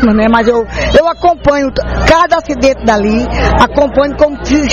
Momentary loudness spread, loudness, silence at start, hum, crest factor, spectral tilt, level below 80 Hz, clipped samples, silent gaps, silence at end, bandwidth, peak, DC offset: 4 LU; -10 LUFS; 0 s; 60 Hz at -25 dBFS; 10 dB; -5.5 dB/octave; -22 dBFS; 0.7%; none; 0 s; 9.8 kHz; 0 dBFS; 0.6%